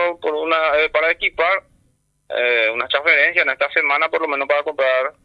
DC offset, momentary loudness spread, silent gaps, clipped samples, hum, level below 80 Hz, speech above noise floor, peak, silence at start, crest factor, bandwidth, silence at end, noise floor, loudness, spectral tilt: under 0.1%; 7 LU; none; under 0.1%; none; -56 dBFS; 45 dB; -2 dBFS; 0 s; 18 dB; 9.6 kHz; 0.15 s; -63 dBFS; -17 LUFS; -3.5 dB/octave